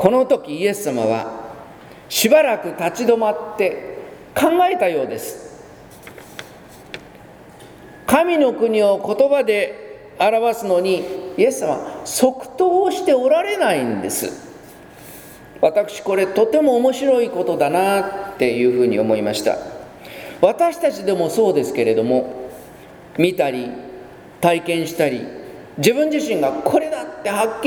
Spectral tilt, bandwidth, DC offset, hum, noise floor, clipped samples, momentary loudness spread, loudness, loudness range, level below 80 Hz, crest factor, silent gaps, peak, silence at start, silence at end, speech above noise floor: -4.5 dB/octave; over 20 kHz; under 0.1%; none; -42 dBFS; under 0.1%; 20 LU; -18 LUFS; 4 LU; -56 dBFS; 18 dB; none; 0 dBFS; 0 s; 0 s; 24 dB